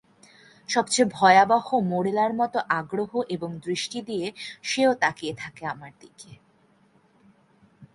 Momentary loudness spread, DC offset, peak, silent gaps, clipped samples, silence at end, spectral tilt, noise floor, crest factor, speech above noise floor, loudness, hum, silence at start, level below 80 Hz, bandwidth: 16 LU; under 0.1%; -4 dBFS; none; under 0.1%; 0.1 s; -4 dB/octave; -61 dBFS; 22 dB; 37 dB; -24 LUFS; none; 0.7 s; -68 dBFS; 11.5 kHz